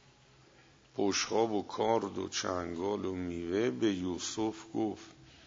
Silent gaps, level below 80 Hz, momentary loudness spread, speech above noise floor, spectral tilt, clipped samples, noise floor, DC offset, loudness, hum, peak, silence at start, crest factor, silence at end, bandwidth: none; -66 dBFS; 7 LU; 28 dB; -4 dB/octave; under 0.1%; -62 dBFS; under 0.1%; -34 LUFS; none; -16 dBFS; 0.95 s; 18 dB; 0 s; 7.8 kHz